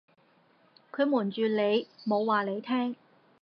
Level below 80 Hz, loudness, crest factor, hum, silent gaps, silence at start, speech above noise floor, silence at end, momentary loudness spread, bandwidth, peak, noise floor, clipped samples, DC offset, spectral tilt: -90 dBFS; -29 LUFS; 18 dB; none; none; 0.95 s; 37 dB; 0.5 s; 7 LU; 5.6 kHz; -12 dBFS; -65 dBFS; under 0.1%; under 0.1%; -8 dB/octave